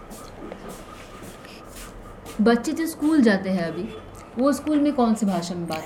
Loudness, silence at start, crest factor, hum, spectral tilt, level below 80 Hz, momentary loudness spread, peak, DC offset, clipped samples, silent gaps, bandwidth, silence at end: -22 LUFS; 0 s; 18 dB; none; -6 dB/octave; -50 dBFS; 21 LU; -6 dBFS; under 0.1%; under 0.1%; none; 17 kHz; 0 s